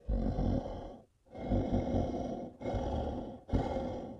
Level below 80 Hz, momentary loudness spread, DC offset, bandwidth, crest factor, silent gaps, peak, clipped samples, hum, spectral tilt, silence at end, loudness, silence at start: -40 dBFS; 12 LU; under 0.1%; 7.6 kHz; 18 dB; none; -18 dBFS; under 0.1%; none; -9 dB/octave; 0 s; -36 LUFS; 0.05 s